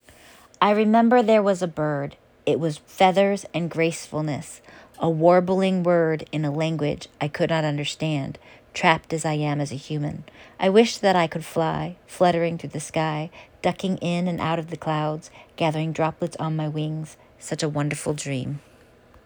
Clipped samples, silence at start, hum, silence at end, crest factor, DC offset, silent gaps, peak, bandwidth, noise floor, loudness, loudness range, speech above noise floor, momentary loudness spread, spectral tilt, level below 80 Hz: under 0.1%; 0.6 s; none; 0.65 s; 20 dB; under 0.1%; none; -2 dBFS; over 20 kHz; -53 dBFS; -23 LUFS; 6 LU; 30 dB; 14 LU; -6 dB/octave; -60 dBFS